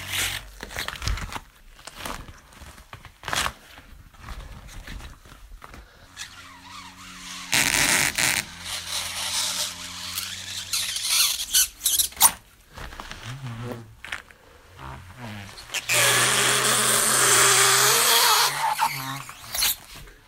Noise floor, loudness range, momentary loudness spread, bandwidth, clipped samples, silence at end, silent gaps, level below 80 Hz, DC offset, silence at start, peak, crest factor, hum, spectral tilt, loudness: -50 dBFS; 18 LU; 25 LU; 16.5 kHz; under 0.1%; 0.15 s; none; -46 dBFS; under 0.1%; 0 s; -2 dBFS; 24 dB; none; 0 dB/octave; -20 LUFS